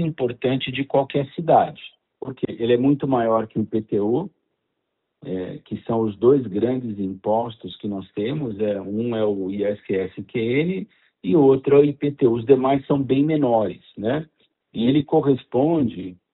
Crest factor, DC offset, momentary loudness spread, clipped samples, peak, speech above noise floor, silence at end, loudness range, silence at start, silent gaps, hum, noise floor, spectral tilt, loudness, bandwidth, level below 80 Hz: 20 dB; under 0.1%; 13 LU; under 0.1%; -2 dBFS; 56 dB; 0.2 s; 6 LU; 0 s; none; none; -77 dBFS; -6.5 dB/octave; -21 LUFS; 4.1 kHz; -58 dBFS